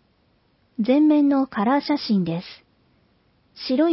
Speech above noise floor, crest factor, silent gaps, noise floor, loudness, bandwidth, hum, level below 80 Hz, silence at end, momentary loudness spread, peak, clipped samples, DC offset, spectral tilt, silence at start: 44 dB; 14 dB; none; -63 dBFS; -21 LUFS; 5.8 kHz; none; -64 dBFS; 0 s; 17 LU; -8 dBFS; under 0.1%; under 0.1%; -10.5 dB/octave; 0.8 s